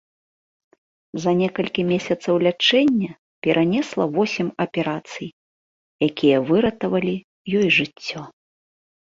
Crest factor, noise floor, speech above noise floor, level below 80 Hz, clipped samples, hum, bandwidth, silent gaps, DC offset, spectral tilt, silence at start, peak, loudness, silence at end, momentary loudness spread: 18 dB; under -90 dBFS; over 70 dB; -58 dBFS; under 0.1%; none; 7.8 kHz; 3.18-3.42 s, 5.33-5.99 s, 7.24-7.45 s; under 0.1%; -5.5 dB/octave; 1.15 s; -4 dBFS; -21 LUFS; 0.9 s; 14 LU